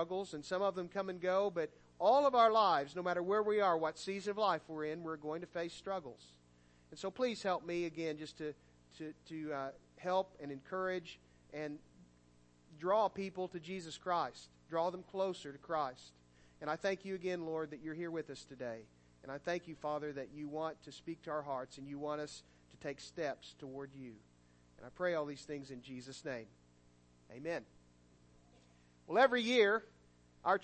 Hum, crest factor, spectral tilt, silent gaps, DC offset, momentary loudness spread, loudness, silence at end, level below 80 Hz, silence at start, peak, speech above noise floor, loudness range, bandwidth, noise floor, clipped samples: 60 Hz at -70 dBFS; 24 dB; -5 dB/octave; none; under 0.1%; 18 LU; -38 LUFS; 0 s; -74 dBFS; 0 s; -16 dBFS; 29 dB; 12 LU; 8.4 kHz; -67 dBFS; under 0.1%